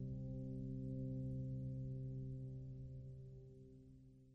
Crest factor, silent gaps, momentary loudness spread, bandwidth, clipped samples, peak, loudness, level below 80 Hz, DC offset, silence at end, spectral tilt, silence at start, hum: 12 dB; none; 16 LU; 0.8 kHz; under 0.1%; -36 dBFS; -49 LUFS; -60 dBFS; under 0.1%; 0 s; -11.5 dB/octave; 0 s; none